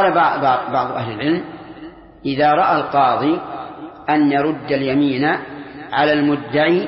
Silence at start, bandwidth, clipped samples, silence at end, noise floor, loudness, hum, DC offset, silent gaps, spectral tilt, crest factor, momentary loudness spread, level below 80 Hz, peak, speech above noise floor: 0 s; 5.8 kHz; under 0.1%; 0 s; -38 dBFS; -17 LUFS; none; under 0.1%; none; -11 dB/octave; 14 dB; 17 LU; -54 dBFS; -4 dBFS; 21 dB